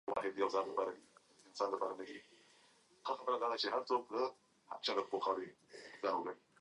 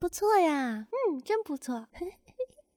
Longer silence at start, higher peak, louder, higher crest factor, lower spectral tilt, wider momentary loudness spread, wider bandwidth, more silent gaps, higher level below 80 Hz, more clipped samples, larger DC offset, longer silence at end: about the same, 0.05 s vs 0 s; second, -22 dBFS vs -12 dBFS; second, -40 LUFS vs -30 LUFS; about the same, 18 dB vs 18 dB; about the same, -3.5 dB/octave vs -4 dB/octave; about the same, 16 LU vs 16 LU; second, 11 kHz vs over 20 kHz; neither; second, -84 dBFS vs -62 dBFS; neither; neither; about the same, 0.25 s vs 0.3 s